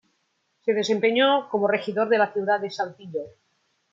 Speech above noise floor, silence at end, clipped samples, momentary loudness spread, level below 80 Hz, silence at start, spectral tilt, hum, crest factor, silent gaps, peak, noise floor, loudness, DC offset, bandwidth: 49 dB; 0.65 s; under 0.1%; 14 LU; -76 dBFS; 0.65 s; -4.5 dB/octave; none; 18 dB; none; -8 dBFS; -72 dBFS; -23 LUFS; under 0.1%; 7.6 kHz